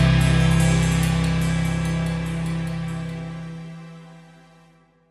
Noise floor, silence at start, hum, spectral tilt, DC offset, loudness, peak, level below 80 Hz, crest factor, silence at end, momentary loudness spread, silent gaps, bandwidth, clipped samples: -55 dBFS; 0 s; 50 Hz at -65 dBFS; -6 dB/octave; under 0.1%; -22 LUFS; -6 dBFS; -32 dBFS; 16 dB; 0.9 s; 19 LU; none; 12.5 kHz; under 0.1%